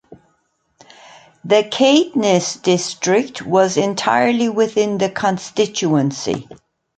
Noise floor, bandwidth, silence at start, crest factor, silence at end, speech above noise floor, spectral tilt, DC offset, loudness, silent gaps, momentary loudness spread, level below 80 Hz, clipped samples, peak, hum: -65 dBFS; 9.4 kHz; 0.1 s; 16 dB; 0.45 s; 48 dB; -4.5 dB/octave; under 0.1%; -17 LUFS; none; 7 LU; -60 dBFS; under 0.1%; -2 dBFS; none